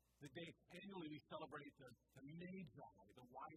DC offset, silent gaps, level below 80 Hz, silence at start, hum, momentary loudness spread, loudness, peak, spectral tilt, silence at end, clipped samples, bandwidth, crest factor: under 0.1%; none; -84 dBFS; 0.2 s; none; 10 LU; -58 LUFS; -40 dBFS; -6 dB/octave; 0 s; under 0.1%; 14.5 kHz; 18 dB